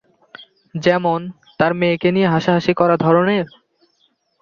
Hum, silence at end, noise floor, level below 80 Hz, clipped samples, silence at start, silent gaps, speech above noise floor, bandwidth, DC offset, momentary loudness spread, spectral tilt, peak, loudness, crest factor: none; 0.95 s; -63 dBFS; -56 dBFS; under 0.1%; 0.4 s; none; 47 dB; 7 kHz; under 0.1%; 10 LU; -7.5 dB/octave; -2 dBFS; -17 LUFS; 16 dB